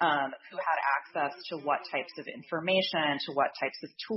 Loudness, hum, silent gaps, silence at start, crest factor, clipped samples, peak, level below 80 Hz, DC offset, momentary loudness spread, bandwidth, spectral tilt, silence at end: -31 LUFS; none; none; 0 s; 18 dB; under 0.1%; -14 dBFS; -82 dBFS; under 0.1%; 9 LU; 6 kHz; -7 dB/octave; 0 s